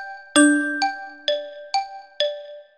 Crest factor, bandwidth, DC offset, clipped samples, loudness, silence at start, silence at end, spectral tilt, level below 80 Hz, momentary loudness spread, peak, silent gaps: 20 dB; 12.5 kHz; 0.1%; under 0.1%; -22 LUFS; 0 s; 0.15 s; -0.5 dB/octave; -74 dBFS; 12 LU; -2 dBFS; none